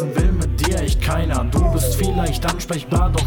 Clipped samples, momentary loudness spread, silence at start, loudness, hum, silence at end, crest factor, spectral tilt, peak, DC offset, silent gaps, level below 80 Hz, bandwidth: under 0.1%; 3 LU; 0 s; -20 LUFS; none; 0 s; 12 dB; -5.5 dB/octave; -6 dBFS; under 0.1%; none; -22 dBFS; 19 kHz